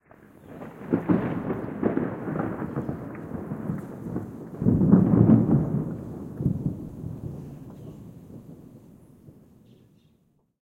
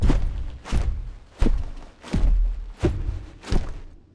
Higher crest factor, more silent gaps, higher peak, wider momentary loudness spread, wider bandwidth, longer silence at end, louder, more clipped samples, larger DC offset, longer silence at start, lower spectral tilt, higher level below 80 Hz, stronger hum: first, 24 dB vs 16 dB; neither; about the same, -4 dBFS vs -6 dBFS; first, 24 LU vs 14 LU; second, 3.6 kHz vs 10 kHz; first, 1.3 s vs 0.15 s; about the same, -26 LUFS vs -28 LUFS; neither; neither; first, 0.45 s vs 0 s; first, -11 dB/octave vs -7 dB/octave; second, -50 dBFS vs -24 dBFS; neither